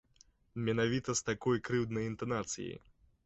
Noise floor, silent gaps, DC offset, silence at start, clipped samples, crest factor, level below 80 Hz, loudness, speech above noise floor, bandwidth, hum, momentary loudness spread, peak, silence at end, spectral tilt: -67 dBFS; none; under 0.1%; 0.55 s; under 0.1%; 18 dB; -62 dBFS; -35 LUFS; 32 dB; 8.2 kHz; none; 11 LU; -18 dBFS; 0.5 s; -5 dB/octave